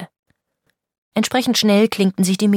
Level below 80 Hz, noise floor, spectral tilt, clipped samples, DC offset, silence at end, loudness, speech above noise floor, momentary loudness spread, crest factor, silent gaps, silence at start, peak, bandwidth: -64 dBFS; -70 dBFS; -4.5 dB/octave; under 0.1%; under 0.1%; 0 s; -17 LUFS; 54 dB; 7 LU; 16 dB; 0.19-0.23 s, 0.98-1.12 s; 0 s; -2 dBFS; 16.5 kHz